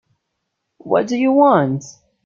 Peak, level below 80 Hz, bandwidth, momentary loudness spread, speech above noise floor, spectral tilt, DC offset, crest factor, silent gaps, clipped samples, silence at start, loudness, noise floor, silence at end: -2 dBFS; -64 dBFS; 7.4 kHz; 9 LU; 60 dB; -7 dB/octave; under 0.1%; 16 dB; none; under 0.1%; 0.85 s; -16 LUFS; -75 dBFS; 0.35 s